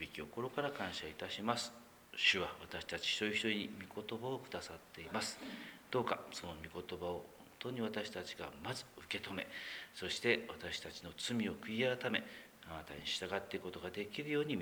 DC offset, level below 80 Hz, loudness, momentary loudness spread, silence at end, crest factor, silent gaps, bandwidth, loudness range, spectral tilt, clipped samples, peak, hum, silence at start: under 0.1%; -70 dBFS; -41 LUFS; 13 LU; 0 s; 24 dB; none; over 20 kHz; 6 LU; -3.5 dB/octave; under 0.1%; -18 dBFS; none; 0 s